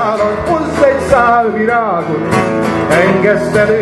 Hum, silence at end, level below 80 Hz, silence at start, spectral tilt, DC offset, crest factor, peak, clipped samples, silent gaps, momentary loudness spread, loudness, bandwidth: none; 0 s; -36 dBFS; 0 s; -6 dB/octave; under 0.1%; 12 dB; 0 dBFS; under 0.1%; none; 5 LU; -12 LUFS; 12.5 kHz